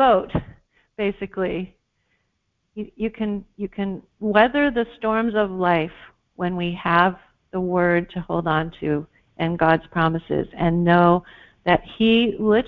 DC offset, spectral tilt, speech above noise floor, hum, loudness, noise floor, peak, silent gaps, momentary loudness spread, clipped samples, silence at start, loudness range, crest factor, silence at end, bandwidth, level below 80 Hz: under 0.1%; -9.5 dB/octave; 52 dB; none; -21 LUFS; -73 dBFS; -2 dBFS; none; 12 LU; under 0.1%; 0 s; 9 LU; 20 dB; 0 s; 4.9 kHz; -48 dBFS